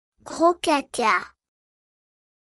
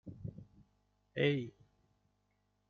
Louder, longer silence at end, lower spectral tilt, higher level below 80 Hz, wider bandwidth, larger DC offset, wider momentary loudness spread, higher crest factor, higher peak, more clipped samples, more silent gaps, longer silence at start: first, -22 LUFS vs -36 LUFS; about the same, 1.3 s vs 1.2 s; second, -2.5 dB/octave vs -5.5 dB/octave; about the same, -64 dBFS vs -68 dBFS; first, 13 kHz vs 6.6 kHz; neither; about the same, 15 LU vs 16 LU; about the same, 20 dB vs 24 dB; first, -6 dBFS vs -18 dBFS; neither; neither; first, 0.25 s vs 0.05 s